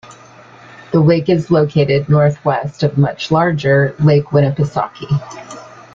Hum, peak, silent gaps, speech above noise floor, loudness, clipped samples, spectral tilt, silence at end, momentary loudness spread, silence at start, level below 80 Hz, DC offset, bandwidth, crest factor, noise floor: none; -2 dBFS; none; 27 dB; -14 LUFS; under 0.1%; -8 dB/octave; 0.25 s; 8 LU; 0.1 s; -48 dBFS; under 0.1%; 7.4 kHz; 14 dB; -41 dBFS